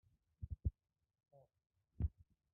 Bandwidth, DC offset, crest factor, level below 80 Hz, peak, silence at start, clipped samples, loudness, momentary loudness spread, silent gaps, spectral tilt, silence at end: 1.5 kHz; under 0.1%; 22 dB; -52 dBFS; -28 dBFS; 0.4 s; under 0.1%; -47 LUFS; 8 LU; none; -14 dB/octave; 0.45 s